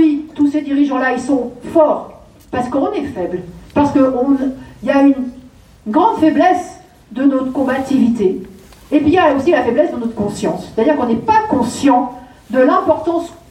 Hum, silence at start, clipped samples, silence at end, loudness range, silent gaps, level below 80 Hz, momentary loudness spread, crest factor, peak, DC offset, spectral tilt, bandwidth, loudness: none; 0 s; under 0.1%; 0.15 s; 2 LU; none; -48 dBFS; 10 LU; 14 dB; -2 dBFS; under 0.1%; -6 dB/octave; 11.5 kHz; -15 LUFS